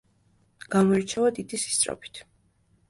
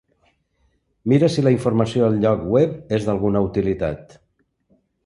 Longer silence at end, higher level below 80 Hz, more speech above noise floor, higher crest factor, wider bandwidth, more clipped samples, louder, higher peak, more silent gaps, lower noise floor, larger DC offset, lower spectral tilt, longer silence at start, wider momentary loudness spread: second, 0.65 s vs 1.05 s; second, -62 dBFS vs -46 dBFS; second, 40 dB vs 47 dB; about the same, 18 dB vs 18 dB; about the same, 11.5 kHz vs 11.5 kHz; neither; second, -25 LUFS vs -19 LUFS; second, -10 dBFS vs -2 dBFS; neither; about the same, -65 dBFS vs -65 dBFS; neither; second, -4 dB/octave vs -8 dB/octave; second, 0.7 s vs 1.05 s; first, 18 LU vs 8 LU